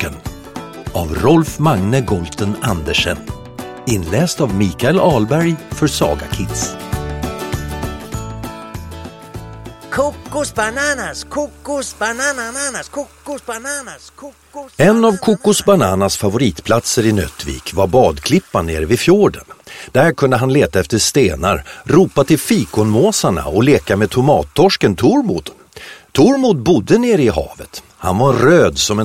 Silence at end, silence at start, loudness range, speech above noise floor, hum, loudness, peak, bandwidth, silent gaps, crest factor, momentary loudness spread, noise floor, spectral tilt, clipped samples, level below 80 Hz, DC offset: 0 s; 0 s; 8 LU; 22 dB; none; -15 LUFS; 0 dBFS; 16.5 kHz; none; 14 dB; 18 LU; -37 dBFS; -5 dB/octave; under 0.1%; -34 dBFS; under 0.1%